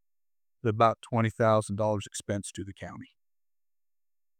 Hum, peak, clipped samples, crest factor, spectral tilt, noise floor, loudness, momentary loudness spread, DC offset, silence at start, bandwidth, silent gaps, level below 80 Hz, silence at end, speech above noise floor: none; -10 dBFS; under 0.1%; 22 dB; -6 dB/octave; under -90 dBFS; -28 LUFS; 17 LU; under 0.1%; 0.65 s; 14.5 kHz; none; -68 dBFS; 1.35 s; over 62 dB